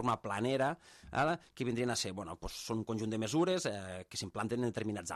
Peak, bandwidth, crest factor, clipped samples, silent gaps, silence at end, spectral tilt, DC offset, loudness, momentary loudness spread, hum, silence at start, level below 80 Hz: -20 dBFS; 14 kHz; 16 dB; under 0.1%; none; 0 s; -4.5 dB/octave; under 0.1%; -36 LUFS; 10 LU; none; 0 s; -60 dBFS